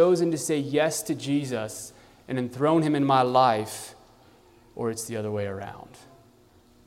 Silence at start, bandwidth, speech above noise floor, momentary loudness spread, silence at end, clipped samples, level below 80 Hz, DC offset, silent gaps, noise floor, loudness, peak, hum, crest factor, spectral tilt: 0 s; 16 kHz; 32 dB; 18 LU; 1.05 s; under 0.1%; -64 dBFS; under 0.1%; none; -57 dBFS; -25 LUFS; -8 dBFS; none; 20 dB; -5 dB/octave